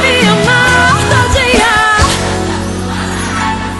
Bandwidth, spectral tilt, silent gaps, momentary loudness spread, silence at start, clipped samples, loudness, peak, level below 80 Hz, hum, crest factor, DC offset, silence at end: 12 kHz; -4 dB/octave; none; 9 LU; 0 s; under 0.1%; -10 LUFS; 0 dBFS; -24 dBFS; none; 10 dB; under 0.1%; 0 s